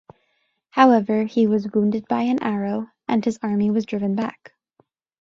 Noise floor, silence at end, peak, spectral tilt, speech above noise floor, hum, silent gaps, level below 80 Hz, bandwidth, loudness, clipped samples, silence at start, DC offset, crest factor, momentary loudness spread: -69 dBFS; 0.9 s; 0 dBFS; -7.5 dB/octave; 50 dB; none; none; -64 dBFS; 7.6 kHz; -21 LUFS; under 0.1%; 0.75 s; under 0.1%; 22 dB; 11 LU